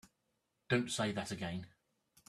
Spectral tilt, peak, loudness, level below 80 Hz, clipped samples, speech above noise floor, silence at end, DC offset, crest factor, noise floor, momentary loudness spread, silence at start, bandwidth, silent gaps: -4.5 dB/octave; -18 dBFS; -38 LUFS; -72 dBFS; under 0.1%; 46 dB; 0.6 s; under 0.1%; 24 dB; -83 dBFS; 12 LU; 0.7 s; 13.5 kHz; none